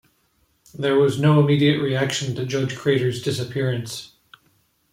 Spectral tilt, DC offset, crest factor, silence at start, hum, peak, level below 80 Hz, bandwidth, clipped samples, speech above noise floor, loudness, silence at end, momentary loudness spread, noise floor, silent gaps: -6 dB/octave; under 0.1%; 16 dB; 0.75 s; none; -6 dBFS; -60 dBFS; 15.5 kHz; under 0.1%; 45 dB; -21 LUFS; 0.85 s; 10 LU; -65 dBFS; none